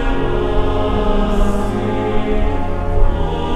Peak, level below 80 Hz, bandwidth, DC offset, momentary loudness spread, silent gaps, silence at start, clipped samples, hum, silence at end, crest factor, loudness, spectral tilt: 0 dBFS; -18 dBFS; 8.8 kHz; under 0.1%; 3 LU; none; 0 s; under 0.1%; none; 0 s; 14 dB; -19 LUFS; -7.5 dB/octave